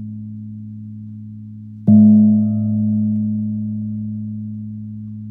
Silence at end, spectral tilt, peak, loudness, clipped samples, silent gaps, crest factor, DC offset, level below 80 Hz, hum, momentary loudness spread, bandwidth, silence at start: 0 s; -14.5 dB/octave; -2 dBFS; -16 LUFS; under 0.1%; none; 16 dB; under 0.1%; -62 dBFS; none; 23 LU; 0.9 kHz; 0 s